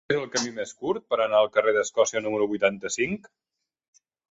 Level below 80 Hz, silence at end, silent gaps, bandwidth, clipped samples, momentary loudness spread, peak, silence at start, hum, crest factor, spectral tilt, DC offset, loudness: -66 dBFS; 1.15 s; none; 8 kHz; under 0.1%; 9 LU; -6 dBFS; 0.1 s; none; 20 dB; -3 dB/octave; under 0.1%; -25 LUFS